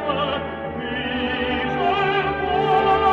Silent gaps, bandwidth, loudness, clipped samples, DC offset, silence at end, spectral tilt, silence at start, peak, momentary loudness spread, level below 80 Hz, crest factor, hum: none; 7.4 kHz; -21 LUFS; under 0.1%; under 0.1%; 0 s; -6.5 dB/octave; 0 s; -8 dBFS; 9 LU; -42 dBFS; 14 dB; none